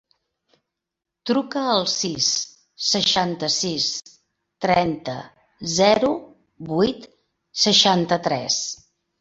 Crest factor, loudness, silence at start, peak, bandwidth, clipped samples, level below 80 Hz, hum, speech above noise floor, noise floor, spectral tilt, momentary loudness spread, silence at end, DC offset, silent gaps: 20 dB; -20 LUFS; 1.25 s; -2 dBFS; 8.2 kHz; under 0.1%; -58 dBFS; none; 63 dB; -84 dBFS; -3 dB/octave; 16 LU; 0.45 s; under 0.1%; none